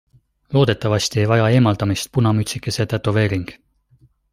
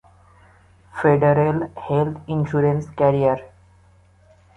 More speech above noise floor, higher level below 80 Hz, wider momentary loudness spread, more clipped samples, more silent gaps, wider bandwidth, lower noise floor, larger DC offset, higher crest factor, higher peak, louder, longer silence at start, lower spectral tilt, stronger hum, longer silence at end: first, 38 dB vs 34 dB; about the same, -48 dBFS vs -50 dBFS; about the same, 7 LU vs 9 LU; neither; neither; first, 15.5 kHz vs 7.6 kHz; about the same, -56 dBFS vs -53 dBFS; neither; about the same, 18 dB vs 18 dB; about the same, -2 dBFS vs -4 dBFS; about the same, -18 LUFS vs -20 LUFS; second, 0.5 s vs 0.95 s; second, -6 dB/octave vs -9.5 dB/octave; neither; second, 0.8 s vs 1.1 s